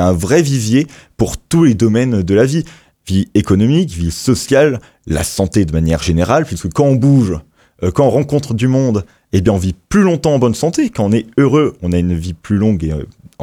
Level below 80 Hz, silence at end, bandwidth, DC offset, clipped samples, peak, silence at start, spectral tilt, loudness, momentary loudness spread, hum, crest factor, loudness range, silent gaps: -32 dBFS; 0 s; 16.5 kHz; under 0.1%; under 0.1%; 0 dBFS; 0 s; -6.5 dB/octave; -14 LUFS; 8 LU; none; 12 dB; 1 LU; none